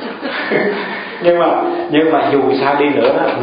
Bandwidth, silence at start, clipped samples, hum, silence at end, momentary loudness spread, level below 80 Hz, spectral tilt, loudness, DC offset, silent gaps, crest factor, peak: 5.2 kHz; 0 s; under 0.1%; none; 0 s; 8 LU; -56 dBFS; -11 dB/octave; -14 LUFS; under 0.1%; none; 14 dB; 0 dBFS